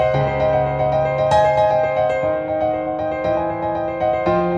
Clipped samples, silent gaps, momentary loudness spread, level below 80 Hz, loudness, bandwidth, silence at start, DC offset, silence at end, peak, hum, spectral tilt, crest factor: under 0.1%; none; 6 LU; -40 dBFS; -18 LUFS; 9 kHz; 0 s; under 0.1%; 0 s; -4 dBFS; none; -7.5 dB/octave; 14 dB